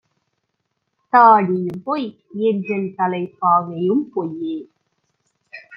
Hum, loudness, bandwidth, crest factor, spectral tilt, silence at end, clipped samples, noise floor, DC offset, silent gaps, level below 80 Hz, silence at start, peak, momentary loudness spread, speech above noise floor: none; -18 LUFS; 5.6 kHz; 18 dB; -9.5 dB/octave; 0 s; under 0.1%; -73 dBFS; under 0.1%; none; -70 dBFS; 1.15 s; -2 dBFS; 15 LU; 56 dB